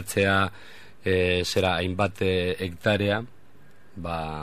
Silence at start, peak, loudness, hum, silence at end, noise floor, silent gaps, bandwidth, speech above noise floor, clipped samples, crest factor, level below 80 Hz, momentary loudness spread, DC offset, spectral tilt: 0 s; -8 dBFS; -25 LUFS; none; 0 s; -56 dBFS; none; 15 kHz; 31 dB; under 0.1%; 18 dB; -52 dBFS; 10 LU; 0.7%; -5 dB/octave